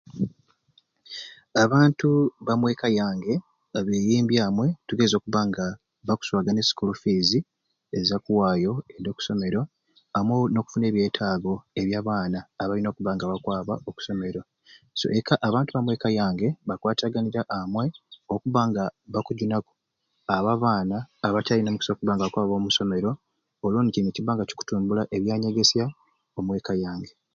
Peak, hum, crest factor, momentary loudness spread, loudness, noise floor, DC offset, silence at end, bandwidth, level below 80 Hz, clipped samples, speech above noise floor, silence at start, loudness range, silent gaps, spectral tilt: -4 dBFS; none; 22 dB; 10 LU; -25 LUFS; -76 dBFS; under 0.1%; 0.25 s; 7.4 kHz; -56 dBFS; under 0.1%; 51 dB; 0.15 s; 3 LU; none; -5.5 dB/octave